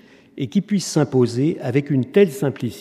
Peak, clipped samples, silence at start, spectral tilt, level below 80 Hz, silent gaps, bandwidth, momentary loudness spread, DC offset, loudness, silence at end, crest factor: -2 dBFS; under 0.1%; 0.35 s; -6.5 dB/octave; -66 dBFS; none; 15 kHz; 7 LU; under 0.1%; -20 LUFS; 0 s; 18 dB